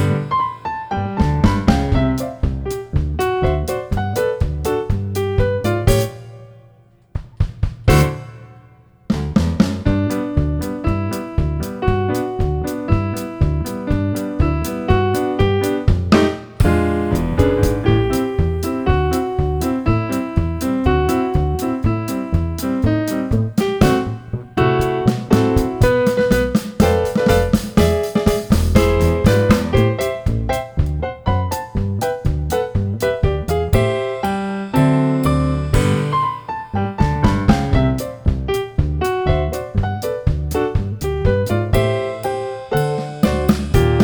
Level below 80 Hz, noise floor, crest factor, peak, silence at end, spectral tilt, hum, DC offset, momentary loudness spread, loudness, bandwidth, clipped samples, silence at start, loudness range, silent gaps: -26 dBFS; -49 dBFS; 16 dB; 0 dBFS; 0 s; -7 dB/octave; none; under 0.1%; 7 LU; -18 LUFS; over 20 kHz; under 0.1%; 0 s; 4 LU; none